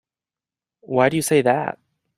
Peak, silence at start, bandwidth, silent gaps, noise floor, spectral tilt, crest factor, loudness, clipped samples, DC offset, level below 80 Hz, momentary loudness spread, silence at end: -2 dBFS; 0.9 s; 15.5 kHz; none; under -90 dBFS; -5 dB/octave; 20 dB; -20 LUFS; under 0.1%; under 0.1%; -64 dBFS; 12 LU; 0.45 s